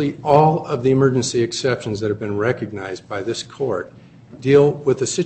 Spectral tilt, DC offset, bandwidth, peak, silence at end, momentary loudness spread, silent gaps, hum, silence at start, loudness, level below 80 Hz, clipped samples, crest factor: -5.5 dB/octave; under 0.1%; 8.6 kHz; 0 dBFS; 0 s; 13 LU; none; none; 0 s; -19 LUFS; -54 dBFS; under 0.1%; 18 dB